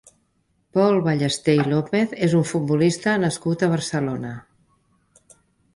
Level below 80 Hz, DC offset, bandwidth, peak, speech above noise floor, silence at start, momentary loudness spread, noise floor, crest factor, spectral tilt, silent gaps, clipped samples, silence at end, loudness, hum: -58 dBFS; under 0.1%; 11.5 kHz; -6 dBFS; 47 dB; 0.75 s; 7 LU; -67 dBFS; 16 dB; -6 dB/octave; none; under 0.1%; 1.35 s; -21 LUFS; none